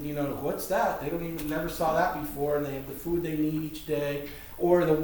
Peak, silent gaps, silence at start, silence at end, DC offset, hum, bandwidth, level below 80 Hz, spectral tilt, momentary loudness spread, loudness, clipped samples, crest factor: -10 dBFS; none; 0 s; 0 s; under 0.1%; none; over 20 kHz; -48 dBFS; -6 dB/octave; 8 LU; -29 LUFS; under 0.1%; 18 dB